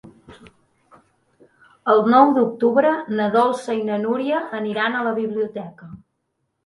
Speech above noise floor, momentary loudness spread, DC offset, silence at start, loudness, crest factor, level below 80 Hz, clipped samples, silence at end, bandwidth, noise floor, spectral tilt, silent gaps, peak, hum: 55 dB; 12 LU; under 0.1%; 0.05 s; -19 LUFS; 20 dB; -66 dBFS; under 0.1%; 0.7 s; 11.5 kHz; -74 dBFS; -6.5 dB/octave; none; 0 dBFS; none